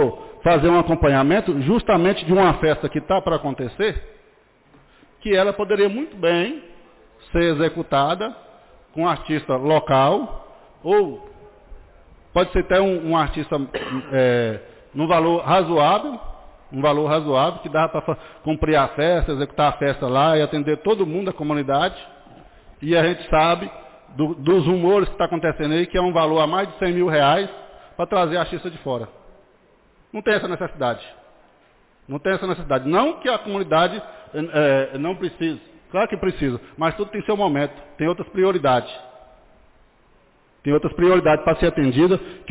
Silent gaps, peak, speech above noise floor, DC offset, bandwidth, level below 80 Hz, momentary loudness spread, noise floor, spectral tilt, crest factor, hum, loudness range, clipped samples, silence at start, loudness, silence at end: none; -8 dBFS; 37 dB; under 0.1%; 4 kHz; -40 dBFS; 11 LU; -56 dBFS; -10.5 dB/octave; 12 dB; none; 4 LU; under 0.1%; 0 s; -20 LUFS; 0 s